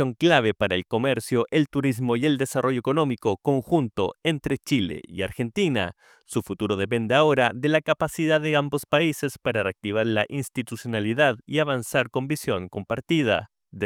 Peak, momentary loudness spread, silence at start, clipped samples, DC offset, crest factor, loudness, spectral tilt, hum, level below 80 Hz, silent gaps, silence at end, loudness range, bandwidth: -4 dBFS; 9 LU; 0 s; under 0.1%; under 0.1%; 20 dB; -24 LUFS; -5.5 dB/octave; none; -56 dBFS; none; 0 s; 3 LU; 17.5 kHz